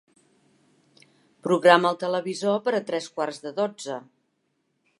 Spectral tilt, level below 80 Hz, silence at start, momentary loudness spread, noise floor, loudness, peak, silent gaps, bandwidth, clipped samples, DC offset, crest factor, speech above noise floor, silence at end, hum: -4.5 dB/octave; -82 dBFS; 1.45 s; 17 LU; -73 dBFS; -24 LUFS; -2 dBFS; none; 11.5 kHz; under 0.1%; under 0.1%; 24 dB; 50 dB; 1 s; none